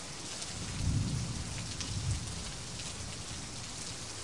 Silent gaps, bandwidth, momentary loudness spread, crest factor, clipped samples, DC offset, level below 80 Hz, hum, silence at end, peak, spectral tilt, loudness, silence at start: none; 11.5 kHz; 6 LU; 18 dB; under 0.1%; 0.3%; -48 dBFS; none; 0 s; -18 dBFS; -3.5 dB/octave; -38 LUFS; 0 s